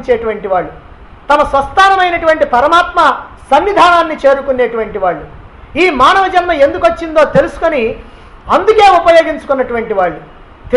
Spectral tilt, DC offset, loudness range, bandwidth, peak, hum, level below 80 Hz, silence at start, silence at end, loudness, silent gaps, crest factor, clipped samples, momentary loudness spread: -4.5 dB/octave; under 0.1%; 2 LU; 11.5 kHz; 0 dBFS; none; -34 dBFS; 0 s; 0 s; -10 LUFS; none; 10 dB; under 0.1%; 9 LU